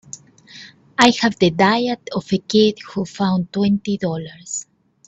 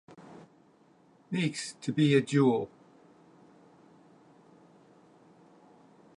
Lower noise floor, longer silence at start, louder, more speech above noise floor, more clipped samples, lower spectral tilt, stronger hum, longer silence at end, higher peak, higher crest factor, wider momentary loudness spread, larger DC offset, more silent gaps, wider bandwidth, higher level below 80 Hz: second, -43 dBFS vs -62 dBFS; about the same, 0.15 s vs 0.2 s; first, -19 LUFS vs -28 LUFS; second, 25 dB vs 35 dB; neither; second, -4.5 dB/octave vs -6 dB/octave; neither; second, 0.45 s vs 3.5 s; first, 0 dBFS vs -12 dBFS; about the same, 20 dB vs 22 dB; second, 19 LU vs 27 LU; neither; neither; second, 8.2 kHz vs 11 kHz; first, -56 dBFS vs -78 dBFS